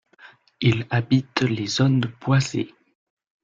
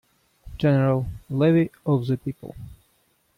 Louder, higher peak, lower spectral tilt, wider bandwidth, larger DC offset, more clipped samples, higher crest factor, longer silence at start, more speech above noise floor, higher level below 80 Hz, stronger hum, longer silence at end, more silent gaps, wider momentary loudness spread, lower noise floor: about the same, -22 LUFS vs -23 LUFS; first, -4 dBFS vs -10 dBFS; second, -6 dB/octave vs -9.5 dB/octave; second, 7.6 kHz vs 10 kHz; neither; neither; first, 20 dB vs 14 dB; second, 0.25 s vs 0.45 s; second, 30 dB vs 44 dB; second, -56 dBFS vs -48 dBFS; neither; about the same, 0.75 s vs 0.65 s; neither; second, 6 LU vs 20 LU; second, -51 dBFS vs -66 dBFS